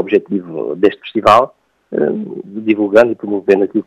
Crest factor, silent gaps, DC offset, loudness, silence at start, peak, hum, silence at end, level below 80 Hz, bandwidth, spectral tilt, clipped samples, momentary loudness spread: 14 dB; none; under 0.1%; -14 LUFS; 0 s; 0 dBFS; none; 0.05 s; -54 dBFS; 12 kHz; -6.5 dB/octave; 0.3%; 12 LU